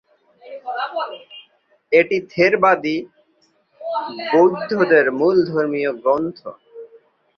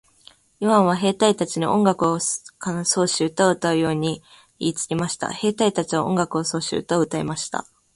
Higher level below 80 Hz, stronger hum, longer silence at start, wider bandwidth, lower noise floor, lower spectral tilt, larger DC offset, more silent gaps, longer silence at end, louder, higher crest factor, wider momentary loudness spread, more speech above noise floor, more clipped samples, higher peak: second, -64 dBFS vs -58 dBFS; neither; second, 0.45 s vs 0.6 s; second, 6.6 kHz vs 11.5 kHz; first, -61 dBFS vs -53 dBFS; first, -6.5 dB/octave vs -4.5 dB/octave; neither; neither; first, 0.5 s vs 0.35 s; first, -18 LUFS vs -22 LUFS; about the same, 18 dB vs 20 dB; first, 18 LU vs 9 LU; first, 44 dB vs 32 dB; neither; about the same, -2 dBFS vs -2 dBFS